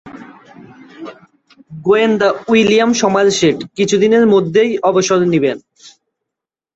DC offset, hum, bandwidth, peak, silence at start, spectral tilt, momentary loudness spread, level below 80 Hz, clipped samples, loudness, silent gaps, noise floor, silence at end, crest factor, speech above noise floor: under 0.1%; none; 8.2 kHz; -2 dBFS; 0.05 s; -4.5 dB/octave; 15 LU; -56 dBFS; under 0.1%; -13 LUFS; none; -83 dBFS; 0.9 s; 14 dB; 70 dB